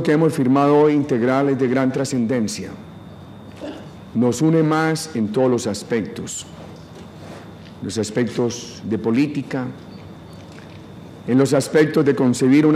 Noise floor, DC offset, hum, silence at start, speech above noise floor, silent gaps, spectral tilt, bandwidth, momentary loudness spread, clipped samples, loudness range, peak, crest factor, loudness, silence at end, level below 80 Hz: -38 dBFS; under 0.1%; none; 0 s; 20 dB; none; -6 dB/octave; 15 kHz; 23 LU; under 0.1%; 6 LU; -4 dBFS; 16 dB; -19 LUFS; 0 s; -56 dBFS